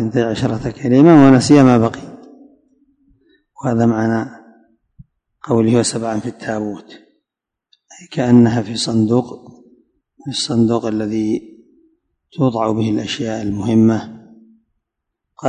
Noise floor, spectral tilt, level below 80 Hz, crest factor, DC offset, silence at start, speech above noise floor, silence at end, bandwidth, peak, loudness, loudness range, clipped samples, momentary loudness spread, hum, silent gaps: -83 dBFS; -6.5 dB/octave; -50 dBFS; 16 dB; under 0.1%; 0 s; 69 dB; 0 s; 10.5 kHz; 0 dBFS; -15 LUFS; 8 LU; under 0.1%; 18 LU; none; none